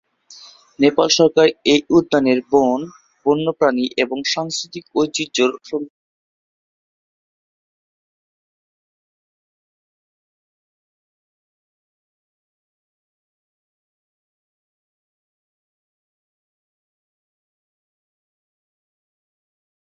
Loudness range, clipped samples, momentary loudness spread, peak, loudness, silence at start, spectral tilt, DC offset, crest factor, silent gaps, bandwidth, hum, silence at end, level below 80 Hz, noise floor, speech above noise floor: 10 LU; under 0.1%; 12 LU; -2 dBFS; -17 LUFS; 0.8 s; -4 dB/octave; under 0.1%; 22 dB; none; 7.8 kHz; none; 14.1 s; -62 dBFS; -44 dBFS; 28 dB